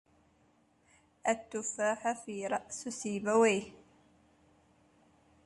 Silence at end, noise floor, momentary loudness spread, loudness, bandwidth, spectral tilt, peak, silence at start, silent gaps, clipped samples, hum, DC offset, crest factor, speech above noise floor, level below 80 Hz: 1.75 s; -69 dBFS; 11 LU; -33 LUFS; 11.5 kHz; -3.5 dB/octave; -16 dBFS; 1.25 s; none; under 0.1%; none; under 0.1%; 20 dB; 36 dB; -74 dBFS